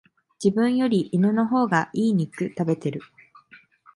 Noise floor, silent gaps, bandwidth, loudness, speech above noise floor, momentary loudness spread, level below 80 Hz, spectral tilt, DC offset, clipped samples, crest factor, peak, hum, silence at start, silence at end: -53 dBFS; none; 11.5 kHz; -23 LUFS; 31 dB; 7 LU; -68 dBFS; -7 dB/octave; under 0.1%; under 0.1%; 20 dB; -4 dBFS; none; 0.4 s; 0.4 s